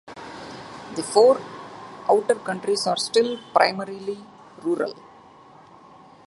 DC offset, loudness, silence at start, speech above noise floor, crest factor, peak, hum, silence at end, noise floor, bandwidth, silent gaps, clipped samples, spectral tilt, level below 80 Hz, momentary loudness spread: under 0.1%; -22 LUFS; 0.05 s; 27 dB; 24 dB; -2 dBFS; none; 1.35 s; -49 dBFS; 11.5 kHz; none; under 0.1%; -3.5 dB/octave; -68 dBFS; 20 LU